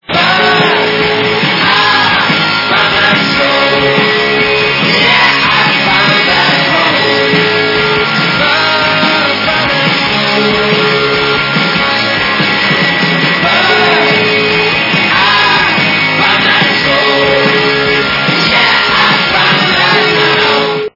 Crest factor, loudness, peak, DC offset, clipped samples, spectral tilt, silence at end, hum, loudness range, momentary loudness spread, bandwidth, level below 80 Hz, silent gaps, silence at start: 10 dB; -8 LUFS; 0 dBFS; under 0.1%; 0.4%; -4.5 dB/octave; 0.05 s; none; 2 LU; 3 LU; 6 kHz; -42 dBFS; none; 0.1 s